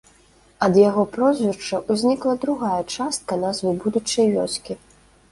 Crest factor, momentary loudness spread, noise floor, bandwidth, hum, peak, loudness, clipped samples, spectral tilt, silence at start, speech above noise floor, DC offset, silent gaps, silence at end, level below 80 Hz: 18 dB; 9 LU; -54 dBFS; 11.5 kHz; none; -2 dBFS; -21 LUFS; under 0.1%; -5 dB/octave; 0.6 s; 34 dB; under 0.1%; none; 0.55 s; -58 dBFS